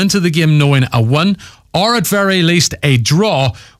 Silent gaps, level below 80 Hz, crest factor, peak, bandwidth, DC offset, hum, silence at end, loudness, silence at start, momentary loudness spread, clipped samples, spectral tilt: none; -42 dBFS; 10 dB; -2 dBFS; 16 kHz; under 0.1%; none; 0.2 s; -12 LUFS; 0 s; 5 LU; under 0.1%; -5 dB/octave